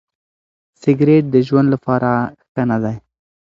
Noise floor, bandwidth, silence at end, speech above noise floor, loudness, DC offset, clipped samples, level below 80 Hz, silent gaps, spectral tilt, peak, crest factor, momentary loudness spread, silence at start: under -90 dBFS; 7.4 kHz; 0.45 s; over 76 dB; -16 LUFS; under 0.1%; under 0.1%; -54 dBFS; 2.49-2.55 s; -9.5 dB/octave; 0 dBFS; 16 dB; 11 LU; 0.85 s